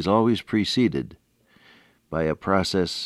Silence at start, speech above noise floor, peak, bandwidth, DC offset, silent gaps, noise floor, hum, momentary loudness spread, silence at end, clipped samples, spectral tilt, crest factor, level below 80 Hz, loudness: 0 s; 34 dB; -6 dBFS; 13 kHz; under 0.1%; none; -57 dBFS; none; 11 LU; 0 s; under 0.1%; -5.5 dB/octave; 18 dB; -50 dBFS; -23 LUFS